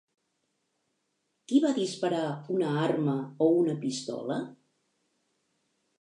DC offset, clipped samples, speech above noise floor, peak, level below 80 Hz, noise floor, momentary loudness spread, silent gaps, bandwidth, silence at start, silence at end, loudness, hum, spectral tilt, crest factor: under 0.1%; under 0.1%; 50 dB; -12 dBFS; -82 dBFS; -78 dBFS; 9 LU; none; 11 kHz; 1.5 s; 1.45 s; -29 LUFS; none; -6 dB/octave; 18 dB